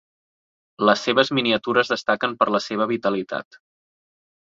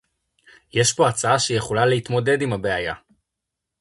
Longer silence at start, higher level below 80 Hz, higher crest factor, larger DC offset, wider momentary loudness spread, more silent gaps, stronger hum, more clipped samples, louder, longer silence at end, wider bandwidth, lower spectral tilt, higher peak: about the same, 0.8 s vs 0.75 s; second, -66 dBFS vs -52 dBFS; about the same, 22 dB vs 18 dB; neither; about the same, 6 LU vs 8 LU; neither; neither; neither; about the same, -21 LUFS vs -20 LUFS; first, 1.1 s vs 0.85 s; second, 7.8 kHz vs 11.5 kHz; about the same, -4.5 dB/octave vs -4 dB/octave; about the same, -2 dBFS vs -4 dBFS